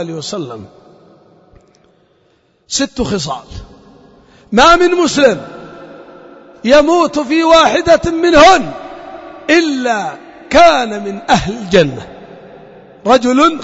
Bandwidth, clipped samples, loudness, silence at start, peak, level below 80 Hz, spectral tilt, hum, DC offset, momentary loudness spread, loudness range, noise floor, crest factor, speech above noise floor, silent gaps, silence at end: 8 kHz; under 0.1%; -11 LUFS; 0 s; 0 dBFS; -36 dBFS; -4 dB/octave; none; under 0.1%; 22 LU; 12 LU; -55 dBFS; 14 dB; 44 dB; none; 0 s